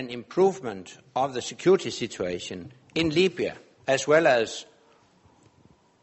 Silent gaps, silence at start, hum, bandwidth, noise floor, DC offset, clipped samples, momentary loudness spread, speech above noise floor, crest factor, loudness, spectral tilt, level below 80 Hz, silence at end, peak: none; 0 s; none; 8.2 kHz; -60 dBFS; under 0.1%; under 0.1%; 16 LU; 34 dB; 20 dB; -25 LUFS; -4.5 dB/octave; -62 dBFS; 1.4 s; -8 dBFS